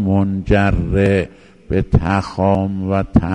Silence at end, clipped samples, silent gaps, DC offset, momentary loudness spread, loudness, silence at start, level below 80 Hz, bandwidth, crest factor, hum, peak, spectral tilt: 0 s; under 0.1%; none; 0.2%; 5 LU; -17 LUFS; 0 s; -28 dBFS; 9.4 kHz; 16 dB; none; 0 dBFS; -8.5 dB/octave